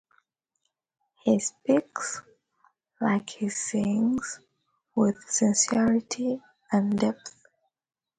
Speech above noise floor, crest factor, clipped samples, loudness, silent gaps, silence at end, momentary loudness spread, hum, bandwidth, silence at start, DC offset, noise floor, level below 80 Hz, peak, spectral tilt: 54 dB; 18 dB; under 0.1%; -26 LUFS; none; 0.9 s; 13 LU; none; 9.6 kHz; 1.25 s; under 0.1%; -79 dBFS; -66 dBFS; -10 dBFS; -4.5 dB/octave